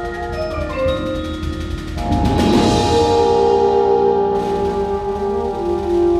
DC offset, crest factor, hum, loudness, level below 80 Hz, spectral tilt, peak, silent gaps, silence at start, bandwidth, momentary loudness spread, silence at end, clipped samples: under 0.1%; 14 dB; none; -17 LUFS; -30 dBFS; -6.5 dB/octave; -2 dBFS; none; 0 s; 13.5 kHz; 10 LU; 0 s; under 0.1%